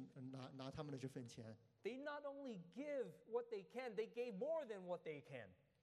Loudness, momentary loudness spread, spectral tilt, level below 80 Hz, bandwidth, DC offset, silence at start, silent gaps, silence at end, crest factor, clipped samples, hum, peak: -51 LUFS; 9 LU; -6.5 dB/octave; -84 dBFS; 13 kHz; under 0.1%; 0 s; none; 0.3 s; 16 dB; under 0.1%; none; -34 dBFS